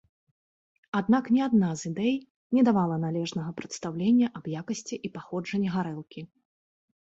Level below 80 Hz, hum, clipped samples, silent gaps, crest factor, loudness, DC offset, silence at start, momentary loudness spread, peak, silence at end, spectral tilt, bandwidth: -68 dBFS; none; under 0.1%; 2.30-2.50 s; 16 dB; -28 LUFS; under 0.1%; 0.95 s; 13 LU; -12 dBFS; 0.75 s; -6.5 dB/octave; 8 kHz